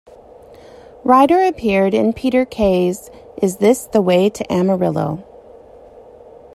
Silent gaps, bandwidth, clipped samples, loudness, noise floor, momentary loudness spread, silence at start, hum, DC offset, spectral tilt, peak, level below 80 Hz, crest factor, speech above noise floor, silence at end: none; 15 kHz; under 0.1%; -16 LUFS; -41 dBFS; 11 LU; 1.05 s; none; under 0.1%; -6 dB/octave; -2 dBFS; -46 dBFS; 16 dB; 26 dB; 1.35 s